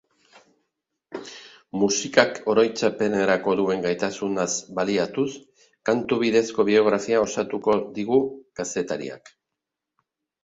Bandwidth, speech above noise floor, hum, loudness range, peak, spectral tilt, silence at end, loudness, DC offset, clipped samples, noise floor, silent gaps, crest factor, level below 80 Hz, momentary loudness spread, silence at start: 8 kHz; 62 dB; none; 2 LU; 0 dBFS; -4 dB/octave; 1.25 s; -23 LUFS; under 0.1%; under 0.1%; -85 dBFS; none; 24 dB; -64 dBFS; 16 LU; 1.1 s